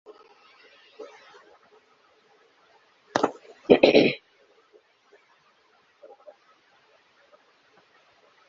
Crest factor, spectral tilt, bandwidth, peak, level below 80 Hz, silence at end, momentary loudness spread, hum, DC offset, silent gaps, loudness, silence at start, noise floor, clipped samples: 28 dB; -3 dB/octave; 7.4 kHz; -2 dBFS; -64 dBFS; 4.35 s; 29 LU; none; under 0.1%; none; -21 LUFS; 1 s; -63 dBFS; under 0.1%